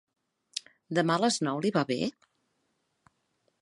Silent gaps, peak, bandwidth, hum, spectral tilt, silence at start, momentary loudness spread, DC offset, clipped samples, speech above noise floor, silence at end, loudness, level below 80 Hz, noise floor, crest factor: none; -12 dBFS; 11.5 kHz; none; -4.5 dB/octave; 0.55 s; 14 LU; under 0.1%; under 0.1%; 49 dB; 1.5 s; -30 LUFS; -76 dBFS; -77 dBFS; 20 dB